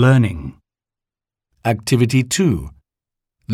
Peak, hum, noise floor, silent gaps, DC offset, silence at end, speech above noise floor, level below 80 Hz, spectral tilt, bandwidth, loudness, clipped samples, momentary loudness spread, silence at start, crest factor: -4 dBFS; none; -88 dBFS; none; under 0.1%; 0 s; 72 dB; -42 dBFS; -6 dB/octave; 14 kHz; -18 LUFS; under 0.1%; 17 LU; 0 s; 16 dB